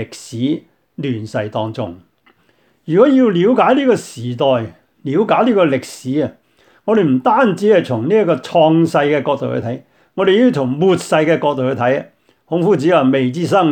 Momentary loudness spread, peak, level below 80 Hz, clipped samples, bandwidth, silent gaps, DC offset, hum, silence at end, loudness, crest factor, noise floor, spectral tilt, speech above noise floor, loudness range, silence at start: 13 LU; 0 dBFS; -62 dBFS; under 0.1%; 13.5 kHz; none; under 0.1%; none; 0 s; -15 LUFS; 14 dB; -57 dBFS; -6.5 dB/octave; 43 dB; 3 LU; 0 s